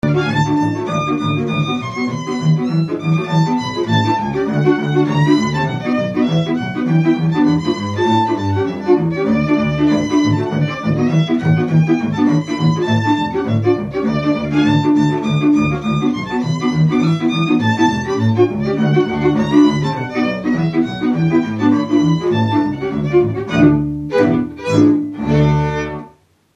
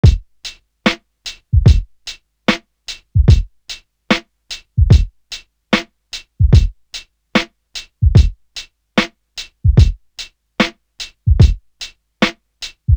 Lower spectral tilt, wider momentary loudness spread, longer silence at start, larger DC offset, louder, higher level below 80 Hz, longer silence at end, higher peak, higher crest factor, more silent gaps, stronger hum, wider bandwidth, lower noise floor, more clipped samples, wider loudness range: first, -7.5 dB/octave vs -6 dB/octave; second, 5 LU vs 19 LU; about the same, 0.05 s vs 0.05 s; neither; about the same, -16 LUFS vs -16 LUFS; second, -42 dBFS vs -20 dBFS; first, 0.45 s vs 0 s; about the same, 0 dBFS vs 0 dBFS; about the same, 16 dB vs 16 dB; neither; neither; second, 7.8 kHz vs 9.4 kHz; first, -47 dBFS vs -35 dBFS; neither; about the same, 1 LU vs 2 LU